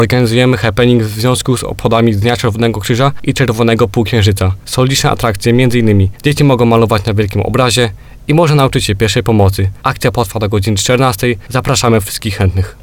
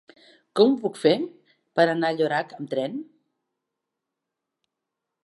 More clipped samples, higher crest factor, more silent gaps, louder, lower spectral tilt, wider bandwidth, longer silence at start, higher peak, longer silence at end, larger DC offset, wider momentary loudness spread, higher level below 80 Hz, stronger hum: first, 0.4% vs under 0.1%; second, 12 dB vs 22 dB; neither; first, -12 LUFS vs -24 LUFS; about the same, -5.5 dB/octave vs -6 dB/octave; first, 19 kHz vs 11.5 kHz; second, 0 s vs 0.55 s; first, 0 dBFS vs -4 dBFS; second, 0.1 s vs 2.2 s; neither; second, 5 LU vs 12 LU; first, -32 dBFS vs -84 dBFS; neither